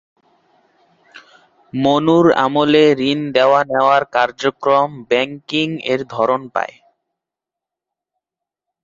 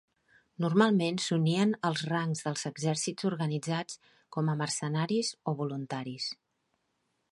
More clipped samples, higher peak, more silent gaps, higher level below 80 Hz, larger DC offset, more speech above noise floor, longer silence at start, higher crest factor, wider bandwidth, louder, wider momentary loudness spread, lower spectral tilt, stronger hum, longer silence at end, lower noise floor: neither; first, -2 dBFS vs -12 dBFS; neither; first, -60 dBFS vs -76 dBFS; neither; first, 70 dB vs 48 dB; first, 1.15 s vs 0.6 s; about the same, 16 dB vs 20 dB; second, 7.6 kHz vs 11.5 kHz; first, -15 LUFS vs -31 LUFS; second, 8 LU vs 11 LU; about the same, -6 dB/octave vs -5 dB/octave; neither; first, 2.15 s vs 1 s; first, -85 dBFS vs -78 dBFS